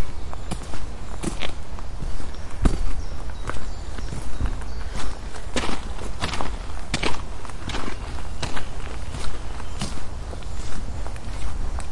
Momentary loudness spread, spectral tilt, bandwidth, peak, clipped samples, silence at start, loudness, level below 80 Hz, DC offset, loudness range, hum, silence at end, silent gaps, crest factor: 9 LU; -4.5 dB/octave; 11.5 kHz; -4 dBFS; under 0.1%; 0 s; -32 LUFS; -30 dBFS; under 0.1%; 3 LU; none; 0 s; none; 14 dB